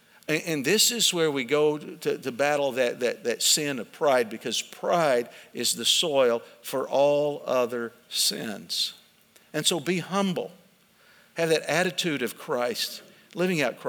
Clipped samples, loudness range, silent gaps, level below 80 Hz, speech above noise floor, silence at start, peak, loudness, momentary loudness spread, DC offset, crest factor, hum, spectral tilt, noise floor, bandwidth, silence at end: under 0.1%; 4 LU; none; -82 dBFS; 33 dB; 0.3 s; -8 dBFS; -25 LUFS; 10 LU; under 0.1%; 20 dB; none; -2.5 dB/octave; -59 dBFS; over 20 kHz; 0 s